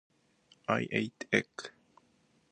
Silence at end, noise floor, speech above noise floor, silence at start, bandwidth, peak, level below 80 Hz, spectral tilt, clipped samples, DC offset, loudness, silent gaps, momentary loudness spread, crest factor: 0.8 s; -70 dBFS; 37 dB; 0.7 s; 9.8 kHz; -10 dBFS; -72 dBFS; -5 dB/octave; under 0.1%; under 0.1%; -33 LUFS; none; 15 LU; 26 dB